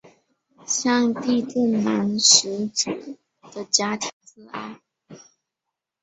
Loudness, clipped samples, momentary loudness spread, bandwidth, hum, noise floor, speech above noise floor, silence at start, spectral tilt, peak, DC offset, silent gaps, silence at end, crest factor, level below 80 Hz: -20 LUFS; under 0.1%; 23 LU; 8.2 kHz; none; -84 dBFS; 63 dB; 0.7 s; -2 dB/octave; 0 dBFS; under 0.1%; 4.13-4.21 s; 0.85 s; 24 dB; -68 dBFS